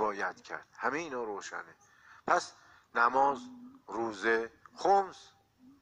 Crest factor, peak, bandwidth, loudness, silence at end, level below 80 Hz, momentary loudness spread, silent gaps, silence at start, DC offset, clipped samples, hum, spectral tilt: 22 dB; -12 dBFS; 10 kHz; -32 LUFS; 0.6 s; -74 dBFS; 16 LU; none; 0 s; under 0.1%; under 0.1%; none; -3.5 dB/octave